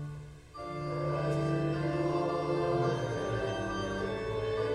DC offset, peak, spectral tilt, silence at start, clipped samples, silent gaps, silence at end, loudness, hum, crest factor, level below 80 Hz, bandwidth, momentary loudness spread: under 0.1%; -18 dBFS; -7 dB/octave; 0 s; under 0.1%; none; 0 s; -33 LUFS; none; 14 dB; -52 dBFS; 11 kHz; 10 LU